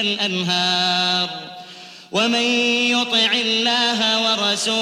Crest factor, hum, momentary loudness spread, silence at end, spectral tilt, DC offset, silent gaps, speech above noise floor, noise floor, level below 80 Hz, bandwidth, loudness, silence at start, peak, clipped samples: 14 dB; none; 13 LU; 0 s; -2.5 dB/octave; under 0.1%; none; 20 dB; -40 dBFS; -68 dBFS; 14.5 kHz; -17 LUFS; 0 s; -6 dBFS; under 0.1%